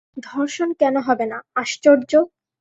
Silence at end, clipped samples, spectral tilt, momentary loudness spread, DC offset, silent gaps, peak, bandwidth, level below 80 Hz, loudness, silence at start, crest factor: 0.35 s; under 0.1%; -3.5 dB/octave; 10 LU; under 0.1%; none; -2 dBFS; 8 kHz; -68 dBFS; -19 LUFS; 0.15 s; 18 dB